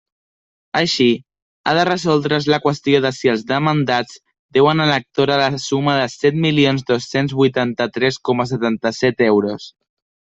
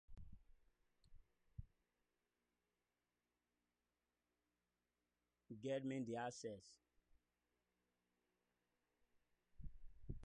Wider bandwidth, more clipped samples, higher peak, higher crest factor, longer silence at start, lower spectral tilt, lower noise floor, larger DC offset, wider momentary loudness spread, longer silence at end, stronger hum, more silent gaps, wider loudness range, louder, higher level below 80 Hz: second, 8 kHz vs 9.4 kHz; neither; first, 0 dBFS vs -36 dBFS; about the same, 18 dB vs 20 dB; first, 0.75 s vs 0.1 s; about the same, -5.5 dB/octave vs -5.5 dB/octave; about the same, under -90 dBFS vs under -90 dBFS; neither; second, 5 LU vs 20 LU; first, 0.7 s vs 0 s; second, none vs 60 Hz at -90 dBFS; first, 1.42-1.64 s, 4.39-4.49 s vs none; second, 1 LU vs 11 LU; first, -17 LUFS vs -49 LUFS; first, -56 dBFS vs -68 dBFS